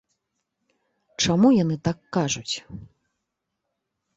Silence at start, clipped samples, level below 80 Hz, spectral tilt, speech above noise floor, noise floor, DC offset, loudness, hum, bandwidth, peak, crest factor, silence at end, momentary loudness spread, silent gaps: 1.2 s; under 0.1%; -56 dBFS; -5 dB/octave; 58 dB; -81 dBFS; under 0.1%; -23 LUFS; none; 8.2 kHz; -6 dBFS; 20 dB; 1.3 s; 24 LU; none